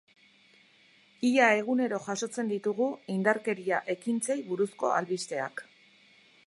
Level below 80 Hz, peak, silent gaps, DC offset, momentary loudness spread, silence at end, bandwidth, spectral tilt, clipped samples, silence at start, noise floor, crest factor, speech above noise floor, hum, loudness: -84 dBFS; -8 dBFS; none; under 0.1%; 10 LU; 0.85 s; 11.5 kHz; -4.5 dB/octave; under 0.1%; 1.2 s; -61 dBFS; 22 dB; 33 dB; none; -29 LUFS